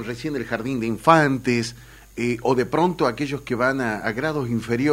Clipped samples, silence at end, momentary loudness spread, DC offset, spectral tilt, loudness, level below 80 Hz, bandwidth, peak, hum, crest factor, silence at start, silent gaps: under 0.1%; 0 s; 11 LU; under 0.1%; -6 dB/octave; -22 LUFS; -50 dBFS; 16 kHz; 0 dBFS; none; 22 dB; 0 s; none